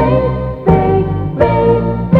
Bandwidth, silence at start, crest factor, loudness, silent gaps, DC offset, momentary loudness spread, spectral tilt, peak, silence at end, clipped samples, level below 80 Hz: 4.8 kHz; 0 s; 12 dB; -13 LUFS; none; under 0.1%; 6 LU; -10.5 dB/octave; 0 dBFS; 0 s; under 0.1%; -26 dBFS